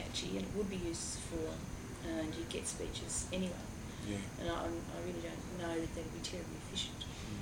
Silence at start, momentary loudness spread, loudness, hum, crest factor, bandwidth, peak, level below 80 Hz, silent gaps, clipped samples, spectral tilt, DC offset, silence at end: 0 s; 6 LU; -41 LUFS; none; 18 dB; over 20 kHz; -24 dBFS; -52 dBFS; none; under 0.1%; -4 dB/octave; under 0.1%; 0 s